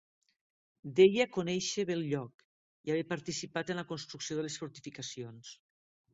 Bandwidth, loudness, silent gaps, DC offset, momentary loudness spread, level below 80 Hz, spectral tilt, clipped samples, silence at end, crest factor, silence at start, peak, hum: 8 kHz; -33 LUFS; 2.34-2.39 s, 2.45-2.84 s; under 0.1%; 20 LU; -74 dBFS; -4.5 dB/octave; under 0.1%; 0.6 s; 22 dB; 0.85 s; -12 dBFS; none